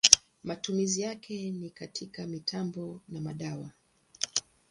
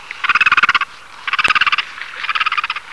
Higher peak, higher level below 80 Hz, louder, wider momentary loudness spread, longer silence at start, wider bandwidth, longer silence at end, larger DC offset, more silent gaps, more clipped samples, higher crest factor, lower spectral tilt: about the same, 0 dBFS vs 0 dBFS; second, -68 dBFS vs -52 dBFS; second, -31 LUFS vs -14 LUFS; about the same, 11 LU vs 13 LU; about the same, 0.05 s vs 0 s; about the same, 11.5 kHz vs 11 kHz; first, 0.3 s vs 0 s; second, under 0.1% vs 0.7%; neither; neither; first, 32 dB vs 18 dB; first, -2 dB/octave vs 0 dB/octave